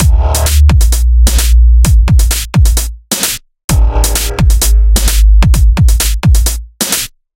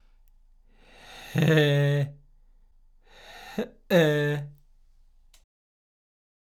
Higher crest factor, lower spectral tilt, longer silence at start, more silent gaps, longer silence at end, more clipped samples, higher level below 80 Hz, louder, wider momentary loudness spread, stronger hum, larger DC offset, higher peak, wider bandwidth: second, 8 dB vs 20 dB; second, -4 dB/octave vs -6.5 dB/octave; second, 0 s vs 1.1 s; first, 3.64-3.68 s vs none; second, 0.35 s vs 1.9 s; neither; first, -8 dBFS vs -58 dBFS; first, -10 LUFS vs -25 LUFS; second, 7 LU vs 24 LU; neither; neither; first, 0 dBFS vs -10 dBFS; about the same, 17 kHz vs 17 kHz